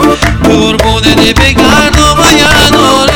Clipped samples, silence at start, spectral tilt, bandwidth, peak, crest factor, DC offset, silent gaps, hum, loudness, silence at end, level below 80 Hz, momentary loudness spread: 5%; 0 s; -4 dB/octave; over 20 kHz; 0 dBFS; 6 dB; under 0.1%; none; none; -5 LUFS; 0 s; -16 dBFS; 4 LU